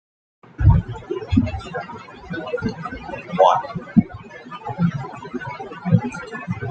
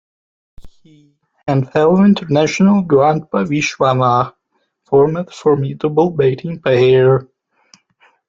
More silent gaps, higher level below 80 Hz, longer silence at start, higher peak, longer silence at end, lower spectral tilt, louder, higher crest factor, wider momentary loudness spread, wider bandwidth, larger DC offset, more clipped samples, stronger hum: neither; first, -34 dBFS vs -52 dBFS; about the same, 0.6 s vs 0.6 s; about the same, -2 dBFS vs -2 dBFS; second, 0 s vs 1.05 s; first, -8.5 dB/octave vs -7 dB/octave; second, -22 LUFS vs -14 LUFS; first, 20 dB vs 14 dB; first, 15 LU vs 7 LU; about the same, 8.2 kHz vs 7.6 kHz; neither; neither; neither